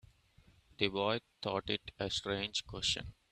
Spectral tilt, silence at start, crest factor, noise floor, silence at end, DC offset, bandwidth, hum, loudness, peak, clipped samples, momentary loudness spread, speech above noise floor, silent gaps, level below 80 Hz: -3.5 dB/octave; 0.8 s; 26 dB; -66 dBFS; 0.2 s; under 0.1%; 13.5 kHz; none; -36 LUFS; -14 dBFS; under 0.1%; 5 LU; 29 dB; none; -60 dBFS